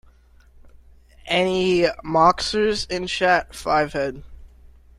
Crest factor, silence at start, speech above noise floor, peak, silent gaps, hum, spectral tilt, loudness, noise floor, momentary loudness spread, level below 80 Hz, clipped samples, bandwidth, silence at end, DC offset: 20 dB; 1.25 s; 32 dB; -4 dBFS; none; none; -4.5 dB/octave; -20 LUFS; -52 dBFS; 8 LU; -44 dBFS; under 0.1%; 13.5 kHz; 0.3 s; under 0.1%